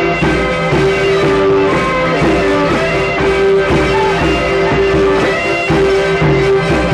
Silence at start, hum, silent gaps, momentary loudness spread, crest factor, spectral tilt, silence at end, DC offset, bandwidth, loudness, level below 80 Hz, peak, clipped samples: 0 s; none; none; 2 LU; 10 dB; -6 dB/octave; 0 s; under 0.1%; 11 kHz; -12 LUFS; -28 dBFS; -2 dBFS; under 0.1%